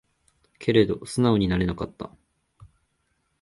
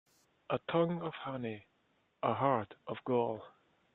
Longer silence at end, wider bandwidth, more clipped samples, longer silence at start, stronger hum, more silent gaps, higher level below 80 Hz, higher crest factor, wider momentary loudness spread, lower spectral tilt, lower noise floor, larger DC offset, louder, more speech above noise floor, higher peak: first, 1.35 s vs 0.45 s; first, 11.5 kHz vs 4.2 kHz; neither; about the same, 0.6 s vs 0.5 s; neither; neither; first, -46 dBFS vs -76 dBFS; about the same, 22 dB vs 22 dB; first, 15 LU vs 11 LU; second, -6.5 dB/octave vs -9 dB/octave; about the same, -72 dBFS vs -75 dBFS; neither; first, -24 LUFS vs -36 LUFS; first, 49 dB vs 40 dB; first, -6 dBFS vs -16 dBFS